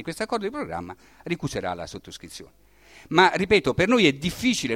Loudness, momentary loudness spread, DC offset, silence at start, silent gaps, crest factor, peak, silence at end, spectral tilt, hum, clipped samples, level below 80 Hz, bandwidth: -23 LUFS; 21 LU; under 0.1%; 0 s; none; 22 dB; -4 dBFS; 0 s; -4.5 dB/octave; none; under 0.1%; -50 dBFS; 16.5 kHz